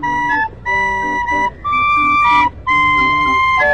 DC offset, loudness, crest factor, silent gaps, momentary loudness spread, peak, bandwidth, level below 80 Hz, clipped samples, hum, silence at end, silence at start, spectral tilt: 0.7%; -13 LUFS; 12 dB; none; 6 LU; -2 dBFS; 9 kHz; -36 dBFS; under 0.1%; none; 0 s; 0 s; -4 dB/octave